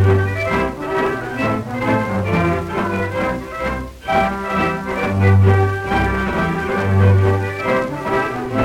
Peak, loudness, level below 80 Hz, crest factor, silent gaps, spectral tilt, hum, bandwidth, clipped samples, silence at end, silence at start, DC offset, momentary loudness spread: -2 dBFS; -18 LUFS; -36 dBFS; 14 dB; none; -7.5 dB/octave; none; 11 kHz; under 0.1%; 0 s; 0 s; under 0.1%; 7 LU